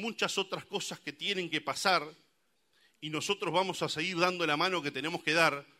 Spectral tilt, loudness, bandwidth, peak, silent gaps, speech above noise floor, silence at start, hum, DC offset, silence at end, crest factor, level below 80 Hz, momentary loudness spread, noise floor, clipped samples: -3 dB/octave; -31 LUFS; 16 kHz; -10 dBFS; none; 43 dB; 0 s; none; under 0.1%; 0.15 s; 22 dB; -78 dBFS; 9 LU; -75 dBFS; under 0.1%